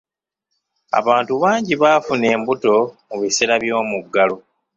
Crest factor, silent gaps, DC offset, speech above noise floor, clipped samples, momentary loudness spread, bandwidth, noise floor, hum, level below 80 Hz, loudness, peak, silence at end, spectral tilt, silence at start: 16 dB; none; under 0.1%; 60 dB; under 0.1%; 6 LU; 8.2 kHz; -77 dBFS; none; -62 dBFS; -17 LUFS; -2 dBFS; 0.4 s; -3.5 dB/octave; 0.95 s